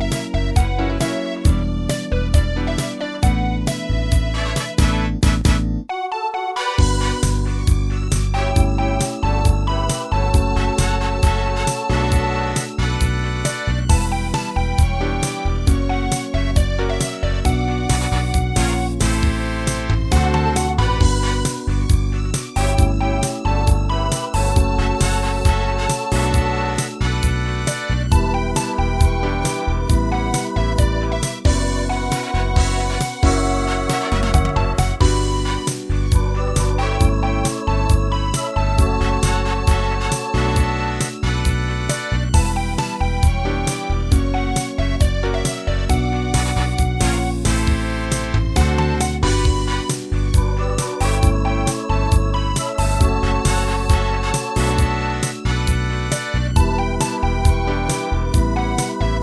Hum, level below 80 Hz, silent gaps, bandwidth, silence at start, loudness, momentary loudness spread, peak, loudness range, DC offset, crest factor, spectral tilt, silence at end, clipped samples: none; -20 dBFS; none; 11 kHz; 0 s; -19 LUFS; 4 LU; 0 dBFS; 1 LU; 0.1%; 16 dB; -5 dB/octave; 0 s; under 0.1%